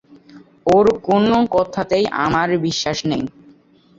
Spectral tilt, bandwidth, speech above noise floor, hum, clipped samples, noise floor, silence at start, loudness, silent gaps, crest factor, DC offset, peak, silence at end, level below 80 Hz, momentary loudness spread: -5.5 dB/octave; 7.8 kHz; 33 dB; none; under 0.1%; -50 dBFS; 0.35 s; -17 LUFS; none; 16 dB; under 0.1%; -2 dBFS; 0.7 s; -48 dBFS; 9 LU